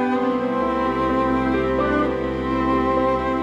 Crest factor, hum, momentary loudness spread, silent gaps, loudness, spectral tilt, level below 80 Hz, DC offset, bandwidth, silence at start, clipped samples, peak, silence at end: 12 dB; none; 3 LU; none; -21 LUFS; -7.5 dB/octave; -36 dBFS; under 0.1%; 8 kHz; 0 s; under 0.1%; -8 dBFS; 0 s